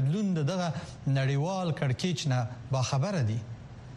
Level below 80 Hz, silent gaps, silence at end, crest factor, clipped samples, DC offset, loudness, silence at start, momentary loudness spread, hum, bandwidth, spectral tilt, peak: -58 dBFS; none; 0 s; 12 dB; under 0.1%; under 0.1%; -30 LUFS; 0 s; 7 LU; none; 10.5 kHz; -6 dB/octave; -16 dBFS